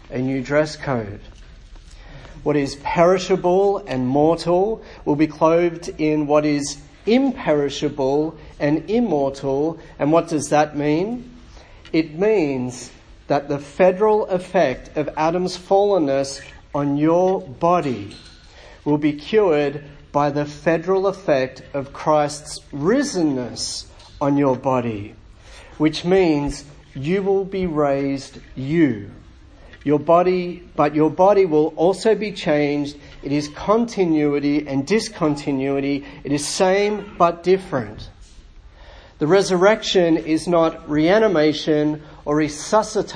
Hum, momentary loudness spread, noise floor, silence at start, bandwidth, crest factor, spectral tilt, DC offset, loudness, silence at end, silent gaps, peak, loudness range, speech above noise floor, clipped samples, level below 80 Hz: none; 11 LU; -44 dBFS; 0.1 s; 10.5 kHz; 18 dB; -5.5 dB/octave; under 0.1%; -20 LUFS; 0 s; none; 0 dBFS; 4 LU; 25 dB; under 0.1%; -46 dBFS